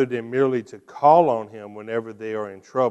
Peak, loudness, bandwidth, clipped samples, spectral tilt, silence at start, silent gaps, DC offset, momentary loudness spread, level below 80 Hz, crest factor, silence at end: -2 dBFS; -22 LUFS; 8.6 kHz; under 0.1%; -7.5 dB/octave; 0 s; none; under 0.1%; 18 LU; -72 dBFS; 18 dB; 0 s